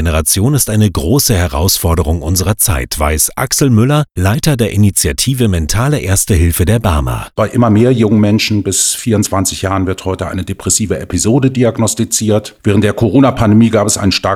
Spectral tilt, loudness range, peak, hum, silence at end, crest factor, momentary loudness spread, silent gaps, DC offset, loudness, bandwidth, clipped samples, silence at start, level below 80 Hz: -5 dB/octave; 2 LU; 0 dBFS; none; 0 s; 12 dB; 5 LU; none; under 0.1%; -12 LUFS; 19 kHz; under 0.1%; 0 s; -26 dBFS